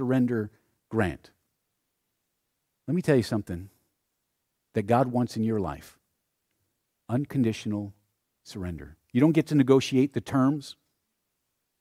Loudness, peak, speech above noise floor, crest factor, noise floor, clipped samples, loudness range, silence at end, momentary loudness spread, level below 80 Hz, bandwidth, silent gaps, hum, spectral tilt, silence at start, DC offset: -26 LUFS; -6 dBFS; 54 dB; 22 dB; -80 dBFS; under 0.1%; 6 LU; 1.1 s; 17 LU; -58 dBFS; 15 kHz; none; none; -7 dB/octave; 0 s; under 0.1%